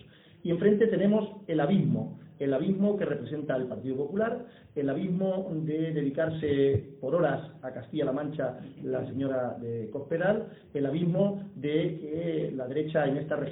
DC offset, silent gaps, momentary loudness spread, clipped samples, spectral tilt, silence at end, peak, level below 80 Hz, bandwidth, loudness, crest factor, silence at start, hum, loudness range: under 0.1%; none; 9 LU; under 0.1%; -11.5 dB/octave; 0 s; -10 dBFS; -64 dBFS; 4 kHz; -30 LUFS; 18 dB; 0.45 s; none; 4 LU